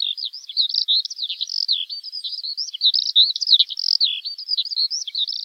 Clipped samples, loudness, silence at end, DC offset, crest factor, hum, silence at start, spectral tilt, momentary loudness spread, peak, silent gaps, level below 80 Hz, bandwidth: under 0.1%; -19 LUFS; 0 s; under 0.1%; 20 dB; none; 0 s; 9.5 dB/octave; 12 LU; -2 dBFS; none; under -90 dBFS; 16 kHz